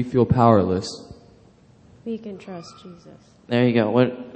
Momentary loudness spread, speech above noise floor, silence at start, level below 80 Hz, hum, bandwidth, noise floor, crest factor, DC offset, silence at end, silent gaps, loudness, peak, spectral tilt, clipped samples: 22 LU; 31 dB; 0 s; -50 dBFS; none; 8.8 kHz; -52 dBFS; 22 dB; under 0.1%; 0 s; none; -20 LUFS; 0 dBFS; -7.5 dB/octave; under 0.1%